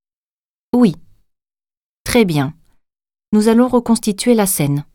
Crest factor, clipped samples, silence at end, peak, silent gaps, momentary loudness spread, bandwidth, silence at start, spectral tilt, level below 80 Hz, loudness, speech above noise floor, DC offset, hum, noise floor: 16 dB; under 0.1%; 0.1 s; 0 dBFS; 1.77-2.05 s, 3.28-3.32 s; 8 LU; 18.5 kHz; 0.75 s; -5.5 dB/octave; -44 dBFS; -15 LUFS; over 76 dB; under 0.1%; none; under -90 dBFS